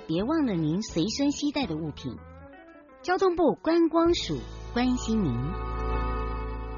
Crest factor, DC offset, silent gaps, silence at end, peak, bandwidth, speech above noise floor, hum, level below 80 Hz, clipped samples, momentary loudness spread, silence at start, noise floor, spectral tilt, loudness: 14 dB; under 0.1%; none; 0 s; -12 dBFS; 7.2 kHz; 24 dB; none; -38 dBFS; under 0.1%; 12 LU; 0 s; -50 dBFS; -5.5 dB/octave; -27 LUFS